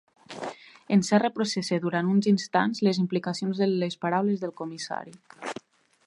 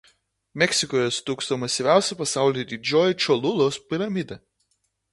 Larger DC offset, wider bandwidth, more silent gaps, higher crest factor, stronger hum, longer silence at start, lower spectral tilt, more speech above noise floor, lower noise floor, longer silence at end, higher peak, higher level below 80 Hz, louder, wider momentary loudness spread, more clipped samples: neither; about the same, 11 kHz vs 11.5 kHz; neither; about the same, 18 dB vs 22 dB; neither; second, 0.3 s vs 0.55 s; first, -5.5 dB/octave vs -3.5 dB/octave; second, 21 dB vs 50 dB; second, -47 dBFS vs -72 dBFS; second, 0.55 s vs 0.75 s; second, -8 dBFS vs -2 dBFS; second, -74 dBFS vs -64 dBFS; second, -26 LUFS vs -23 LUFS; first, 15 LU vs 8 LU; neither